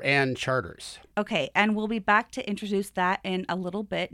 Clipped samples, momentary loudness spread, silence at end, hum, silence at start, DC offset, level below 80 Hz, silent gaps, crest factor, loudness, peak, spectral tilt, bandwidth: under 0.1%; 9 LU; 0.05 s; none; 0 s; under 0.1%; -60 dBFS; none; 20 dB; -27 LUFS; -6 dBFS; -5 dB/octave; 14 kHz